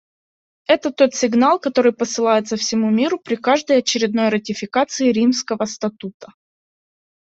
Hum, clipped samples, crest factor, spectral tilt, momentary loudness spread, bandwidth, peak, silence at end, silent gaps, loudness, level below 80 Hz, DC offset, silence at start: none; under 0.1%; 18 dB; -4 dB/octave; 8 LU; 8 kHz; -2 dBFS; 0.95 s; 6.14-6.20 s; -18 LUFS; -62 dBFS; under 0.1%; 0.7 s